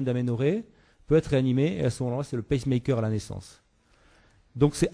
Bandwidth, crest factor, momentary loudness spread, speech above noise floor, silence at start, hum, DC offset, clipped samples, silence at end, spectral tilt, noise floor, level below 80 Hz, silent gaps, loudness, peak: 11 kHz; 20 dB; 9 LU; 36 dB; 0 s; none; under 0.1%; under 0.1%; 0.05 s; -7 dB/octave; -62 dBFS; -48 dBFS; none; -27 LUFS; -8 dBFS